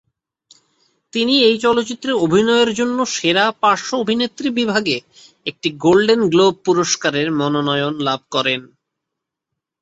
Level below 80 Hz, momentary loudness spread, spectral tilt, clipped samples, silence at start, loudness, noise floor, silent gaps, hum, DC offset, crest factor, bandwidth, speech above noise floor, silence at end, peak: -58 dBFS; 8 LU; -4 dB/octave; under 0.1%; 1.15 s; -17 LUFS; -81 dBFS; none; none; under 0.1%; 16 dB; 8.2 kHz; 65 dB; 1.15 s; -2 dBFS